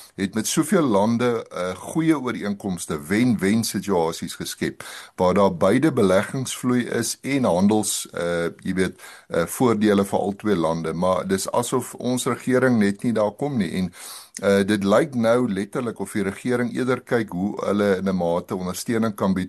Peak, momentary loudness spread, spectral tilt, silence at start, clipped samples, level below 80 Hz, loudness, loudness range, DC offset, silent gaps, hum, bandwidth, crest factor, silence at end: -4 dBFS; 9 LU; -5.5 dB/octave; 0 s; under 0.1%; -58 dBFS; -22 LUFS; 2 LU; under 0.1%; none; none; 13 kHz; 18 dB; 0 s